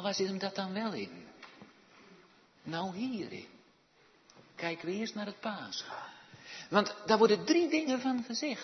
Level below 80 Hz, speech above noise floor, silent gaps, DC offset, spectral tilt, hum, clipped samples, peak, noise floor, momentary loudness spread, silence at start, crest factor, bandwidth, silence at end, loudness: -80 dBFS; 33 dB; none; under 0.1%; -3.5 dB/octave; none; under 0.1%; -10 dBFS; -66 dBFS; 23 LU; 0 s; 24 dB; 6.2 kHz; 0 s; -33 LUFS